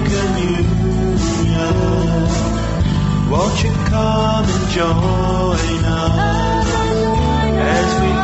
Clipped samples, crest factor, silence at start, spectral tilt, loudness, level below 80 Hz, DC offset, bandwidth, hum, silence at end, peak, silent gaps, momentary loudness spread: under 0.1%; 12 dB; 0 s; -6 dB/octave; -16 LUFS; -24 dBFS; under 0.1%; 8.2 kHz; none; 0 s; -2 dBFS; none; 2 LU